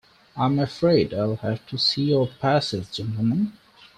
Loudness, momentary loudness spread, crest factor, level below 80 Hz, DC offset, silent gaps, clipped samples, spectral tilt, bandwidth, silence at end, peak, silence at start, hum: -23 LUFS; 9 LU; 16 dB; -56 dBFS; under 0.1%; none; under 0.1%; -6.5 dB/octave; 11 kHz; 0.45 s; -6 dBFS; 0.35 s; none